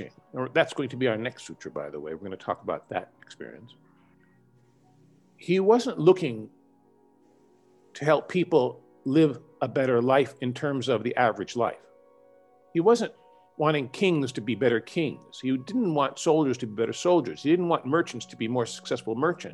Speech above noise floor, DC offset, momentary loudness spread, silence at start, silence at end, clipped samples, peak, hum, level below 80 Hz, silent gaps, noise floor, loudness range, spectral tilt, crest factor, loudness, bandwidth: 35 dB; under 0.1%; 14 LU; 0 s; 0 s; under 0.1%; -6 dBFS; none; -74 dBFS; none; -61 dBFS; 8 LU; -6 dB/octave; 22 dB; -26 LUFS; 11.5 kHz